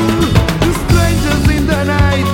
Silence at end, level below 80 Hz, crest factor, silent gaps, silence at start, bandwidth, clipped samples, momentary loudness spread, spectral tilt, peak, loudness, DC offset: 0 s; -20 dBFS; 12 dB; none; 0 s; 17 kHz; under 0.1%; 2 LU; -6 dB/octave; 0 dBFS; -13 LUFS; under 0.1%